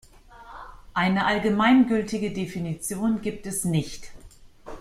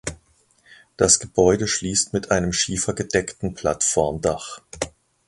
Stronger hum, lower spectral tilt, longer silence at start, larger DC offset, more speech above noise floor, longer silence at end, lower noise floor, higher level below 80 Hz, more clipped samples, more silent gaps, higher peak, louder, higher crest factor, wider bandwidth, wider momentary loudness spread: neither; first, -5 dB/octave vs -3 dB/octave; first, 0.3 s vs 0.05 s; neither; second, 24 dB vs 38 dB; second, 0 s vs 0.4 s; second, -48 dBFS vs -60 dBFS; second, -50 dBFS vs -44 dBFS; neither; neither; second, -8 dBFS vs 0 dBFS; second, -24 LUFS vs -21 LUFS; about the same, 18 dB vs 22 dB; first, 15 kHz vs 11.5 kHz; first, 24 LU vs 15 LU